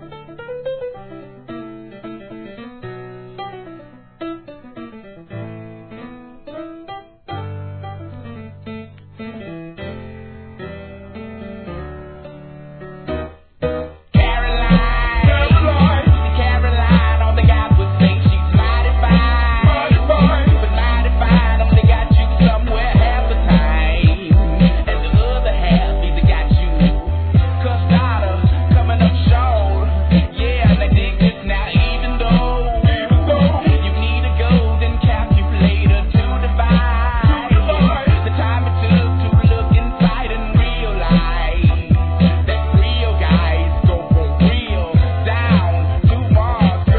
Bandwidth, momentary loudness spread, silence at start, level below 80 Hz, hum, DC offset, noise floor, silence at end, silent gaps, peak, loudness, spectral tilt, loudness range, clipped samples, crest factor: 4.5 kHz; 20 LU; 0 s; -18 dBFS; none; 0.2%; -40 dBFS; 0 s; none; 0 dBFS; -15 LUFS; -11 dB/octave; 19 LU; under 0.1%; 14 dB